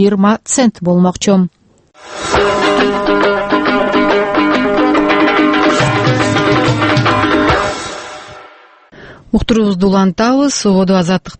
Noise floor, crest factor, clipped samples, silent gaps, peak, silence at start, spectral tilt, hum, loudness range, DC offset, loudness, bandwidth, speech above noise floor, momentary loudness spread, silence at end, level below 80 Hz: -41 dBFS; 12 dB; under 0.1%; none; 0 dBFS; 0 s; -5 dB/octave; none; 4 LU; under 0.1%; -12 LUFS; 8.8 kHz; 30 dB; 7 LU; 0.05 s; -34 dBFS